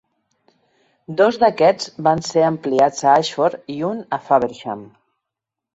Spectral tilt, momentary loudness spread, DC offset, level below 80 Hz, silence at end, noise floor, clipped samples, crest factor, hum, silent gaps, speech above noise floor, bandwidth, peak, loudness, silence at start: -5 dB/octave; 11 LU; under 0.1%; -60 dBFS; 0.9 s; -84 dBFS; under 0.1%; 18 dB; none; none; 66 dB; 8 kHz; -2 dBFS; -18 LUFS; 1.1 s